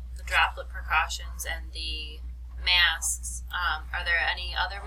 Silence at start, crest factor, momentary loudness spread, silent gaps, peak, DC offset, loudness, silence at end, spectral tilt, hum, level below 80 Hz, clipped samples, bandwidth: 0 s; 20 dB; 14 LU; none; -8 dBFS; under 0.1%; -27 LUFS; 0 s; -0.5 dB/octave; none; -38 dBFS; under 0.1%; 16.5 kHz